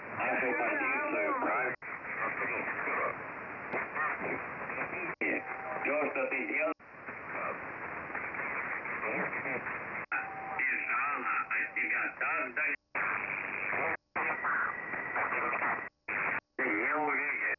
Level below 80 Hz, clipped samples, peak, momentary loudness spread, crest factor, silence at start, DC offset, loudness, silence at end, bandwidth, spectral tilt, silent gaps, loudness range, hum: -74 dBFS; under 0.1%; -20 dBFS; 8 LU; 14 dB; 0 s; under 0.1%; -33 LUFS; 0.05 s; 6 kHz; -8 dB/octave; none; 3 LU; none